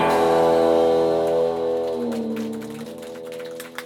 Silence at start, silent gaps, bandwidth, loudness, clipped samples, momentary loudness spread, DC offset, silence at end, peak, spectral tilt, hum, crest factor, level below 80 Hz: 0 s; none; 17 kHz; -20 LUFS; under 0.1%; 17 LU; under 0.1%; 0 s; -8 dBFS; -5.5 dB/octave; none; 14 dB; -54 dBFS